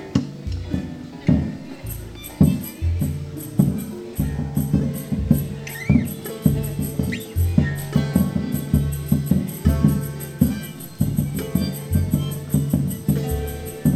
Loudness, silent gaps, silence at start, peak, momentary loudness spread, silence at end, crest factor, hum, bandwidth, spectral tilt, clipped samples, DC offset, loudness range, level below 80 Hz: -23 LUFS; none; 0 s; -2 dBFS; 10 LU; 0 s; 20 dB; none; 15 kHz; -7 dB/octave; under 0.1%; under 0.1%; 2 LU; -32 dBFS